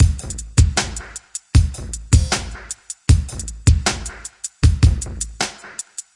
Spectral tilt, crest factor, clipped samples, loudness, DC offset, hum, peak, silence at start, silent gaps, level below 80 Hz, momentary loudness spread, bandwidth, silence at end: -4 dB/octave; 18 dB; under 0.1%; -19 LUFS; under 0.1%; none; 0 dBFS; 0 s; none; -24 dBFS; 14 LU; 11.5 kHz; 0.15 s